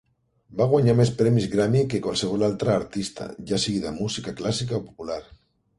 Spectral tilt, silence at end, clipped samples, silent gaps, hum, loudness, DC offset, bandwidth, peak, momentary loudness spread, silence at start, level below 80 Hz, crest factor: -6 dB/octave; 0.55 s; under 0.1%; none; none; -24 LUFS; under 0.1%; 11.5 kHz; -6 dBFS; 13 LU; 0.5 s; -52 dBFS; 18 dB